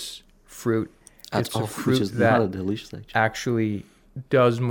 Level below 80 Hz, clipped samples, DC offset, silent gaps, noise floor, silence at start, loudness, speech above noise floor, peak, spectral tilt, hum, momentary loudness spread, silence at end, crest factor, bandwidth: -56 dBFS; under 0.1%; under 0.1%; none; -45 dBFS; 0 s; -24 LUFS; 22 dB; -6 dBFS; -6 dB/octave; none; 16 LU; 0 s; 18 dB; 19.5 kHz